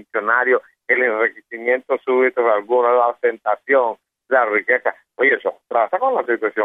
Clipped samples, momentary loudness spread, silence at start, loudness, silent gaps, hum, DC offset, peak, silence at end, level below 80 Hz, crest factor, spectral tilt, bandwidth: under 0.1%; 6 LU; 0.15 s; -18 LUFS; none; none; under 0.1%; -2 dBFS; 0 s; -78 dBFS; 16 dB; -6.5 dB/octave; 3.9 kHz